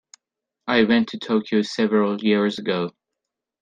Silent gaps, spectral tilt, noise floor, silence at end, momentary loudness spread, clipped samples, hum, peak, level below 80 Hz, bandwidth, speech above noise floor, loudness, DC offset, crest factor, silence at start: none; -6 dB/octave; -84 dBFS; 0.7 s; 8 LU; under 0.1%; none; -4 dBFS; -64 dBFS; 9 kHz; 63 dB; -21 LUFS; under 0.1%; 18 dB; 0.65 s